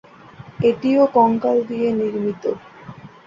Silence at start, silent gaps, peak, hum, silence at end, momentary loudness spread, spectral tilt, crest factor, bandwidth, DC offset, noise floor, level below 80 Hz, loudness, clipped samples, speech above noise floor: 0.4 s; none; -4 dBFS; none; 0.2 s; 21 LU; -8.5 dB/octave; 16 dB; 7.4 kHz; under 0.1%; -42 dBFS; -58 dBFS; -19 LUFS; under 0.1%; 24 dB